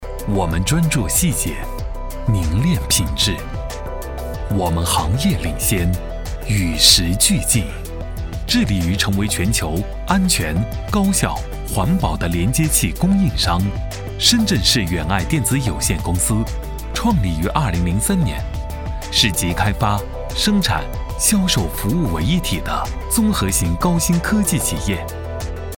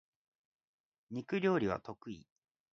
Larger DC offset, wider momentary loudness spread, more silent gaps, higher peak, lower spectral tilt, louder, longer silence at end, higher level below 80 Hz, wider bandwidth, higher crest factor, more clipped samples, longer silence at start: neither; second, 13 LU vs 17 LU; neither; first, 0 dBFS vs -20 dBFS; second, -4 dB/octave vs -5.5 dB/octave; first, -18 LUFS vs -36 LUFS; second, 0 s vs 0.55 s; first, -26 dBFS vs -70 dBFS; first, 19 kHz vs 7 kHz; about the same, 18 dB vs 20 dB; neither; second, 0 s vs 1.1 s